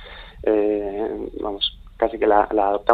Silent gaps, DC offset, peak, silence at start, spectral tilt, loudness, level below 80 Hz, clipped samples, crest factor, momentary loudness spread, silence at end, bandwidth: none; under 0.1%; 0 dBFS; 0 s; -6.5 dB/octave; -22 LUFS; -44 dBFS; under 0.1%; 20 dB; 10 LU; 0 s; 4.7 kHz